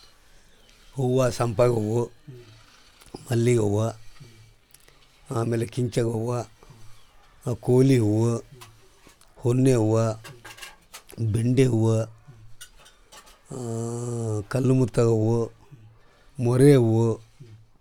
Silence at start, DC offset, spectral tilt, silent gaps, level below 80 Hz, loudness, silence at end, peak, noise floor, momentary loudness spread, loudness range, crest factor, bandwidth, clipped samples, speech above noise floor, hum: 0.95 s; under 0.1%; -7.5 dB/octave; none; -54 dBFS; -23 LUFS; 0.25 s; -4 dBFS; -55 dBFS; 21 LU; 6 LU; 20 dB; 14.5 kHz; under 0.1%; 32 dB; none